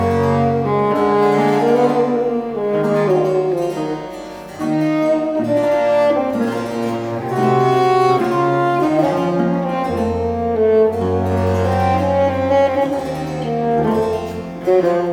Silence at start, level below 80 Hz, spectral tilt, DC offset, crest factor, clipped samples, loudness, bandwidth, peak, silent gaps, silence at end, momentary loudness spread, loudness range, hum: 0 s; -46 dBFS; -7.5 dB/octave; under 0.1%; 14 dB; under 0.1%; -17 LUFS; 17.5 kHz; -2 dBFS; none; 0 s; 7 LU; 2 LU; none